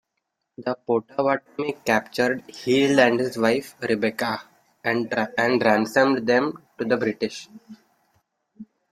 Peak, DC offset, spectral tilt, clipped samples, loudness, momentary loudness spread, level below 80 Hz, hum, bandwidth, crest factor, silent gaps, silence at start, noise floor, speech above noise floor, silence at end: -4 dBFS; under 0.1%; -5 dB/octave; under 0.1%; -23 LUFS; 11 LU; -66 dBFS; none; 15.5 kHz; 20 dB; none; 0.6 s; -79 dBFS; 56 dB; 0.25 s